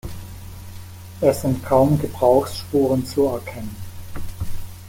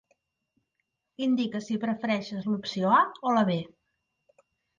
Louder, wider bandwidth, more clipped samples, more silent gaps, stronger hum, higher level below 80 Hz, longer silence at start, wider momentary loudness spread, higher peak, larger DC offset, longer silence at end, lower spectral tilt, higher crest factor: first, -19 LUFS vs -27 LUFS; first, 17 kHz vs 7.4 kHz; neither; neither; neither; first, -40 dBFS vs -72 dBFS; second, 0.05 s vs 1.2 s; first, 21 LU vs 9 LU; first, -2 dBFS vs -10 dBFS; neither; second, 0 s vs 1.1 s; about the same, -7 dB/octave vs -6.5 dB/octave; about the same, 18 dB vs 20 dB